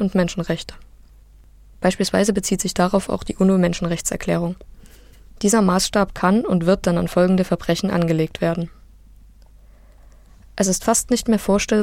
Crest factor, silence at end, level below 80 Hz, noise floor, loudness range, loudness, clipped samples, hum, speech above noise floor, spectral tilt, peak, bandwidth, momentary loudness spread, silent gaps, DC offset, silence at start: 18 dB; 0 s; -40 dBFS; -47 dBFS; 5 LU; -20 LUFS; under 0.1%; none; 28 dB; -5 dB/octave; -4 dBFS; 16.5 kHz; 8 LU; none; under 0.1%; 0 s